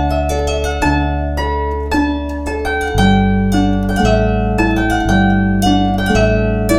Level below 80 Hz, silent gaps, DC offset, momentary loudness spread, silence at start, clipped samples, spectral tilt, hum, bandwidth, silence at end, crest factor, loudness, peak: -22 dBFS; none; under 0.1%; 6 LU; 0 s; under 0.1%; -6 dB/octave; none; 15.5 kHz; 0 s; 14 dB; -15 LUFS; 0 dBFS